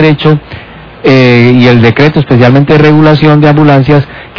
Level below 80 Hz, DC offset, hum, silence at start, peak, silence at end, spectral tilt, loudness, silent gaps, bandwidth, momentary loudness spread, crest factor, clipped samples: -32 dBFS; under 0.1%; none; 0 s; 0 dBFS; 0.1 s; -8.5 dB/octave; -5 LUFS; none; 5.4 kHz; 6 LU; 4 dB; 20%